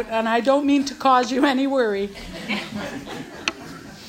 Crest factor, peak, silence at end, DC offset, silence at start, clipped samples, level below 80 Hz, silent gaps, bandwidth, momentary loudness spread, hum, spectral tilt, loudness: 20 dB; -2 dBFS; 0 s; under 0.1%; 0 s; under 0.1%; -52 dBFS; none; 16 kHz; 15 LU; none; -4 dB/octave; -21 LUFS